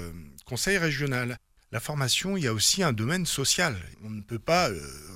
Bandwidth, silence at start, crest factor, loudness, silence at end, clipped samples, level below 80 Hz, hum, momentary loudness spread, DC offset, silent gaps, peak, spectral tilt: 16.5 kHz; 0 s; 20 dB; -26 LUFS; 0 s; under 0.1%; -50 dBFS; none; 16 LU; under 0.1%; none; -10 dBFS; -3 dB/octave